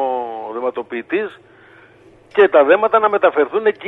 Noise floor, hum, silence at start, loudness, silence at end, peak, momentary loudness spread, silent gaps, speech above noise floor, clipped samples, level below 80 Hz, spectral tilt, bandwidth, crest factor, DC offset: -47 dBFS; none; 0 s; -16 LUFS; 0 s; 0 dBFS; 13 LU; none; 32 dB; under 0.1%; -66 dBFS; -6.5 dB/octave; 4.1 kHz; 16 dB; under 0.1%